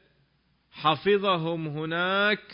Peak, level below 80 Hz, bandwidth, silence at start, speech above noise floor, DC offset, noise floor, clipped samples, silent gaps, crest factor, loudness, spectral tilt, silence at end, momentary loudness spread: -10 dBFS; -68 dBFS; 5.4 kHz; 0.75 s; 43 dB; under 0.1%; -68 dBFS; under 0.1%; none; 16 dB; -26 LUFS; -9.5 dB/octave; 0 s; 7 LU